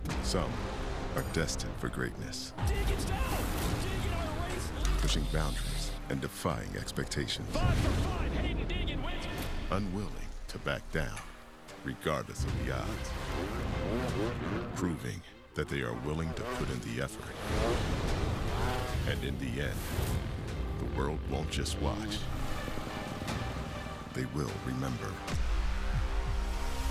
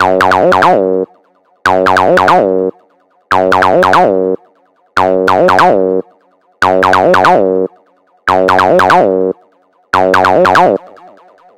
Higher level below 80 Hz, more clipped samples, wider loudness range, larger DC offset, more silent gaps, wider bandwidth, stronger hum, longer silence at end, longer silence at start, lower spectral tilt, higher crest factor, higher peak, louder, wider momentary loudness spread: first, -38 dBFS vs -48 dBFS; second, under 0.1% vs 0.2%; about the same, 3 LU vs 1 LU; second, under 0.1% vs 0.8%; neither; about the same, 16 kHz vs 17 kHz; neither; second, 0 s vs 0.7 s; about the same, 0 s vs 0 s; about the same, -5 dB/octave vs -5.5 dB/octave; first, 18 dB vs 10 dB; second, -16 dBFS vs 0 dBFS; second, -35 LUFS vs -9 LUFS; second, 6 LU vs 10 LU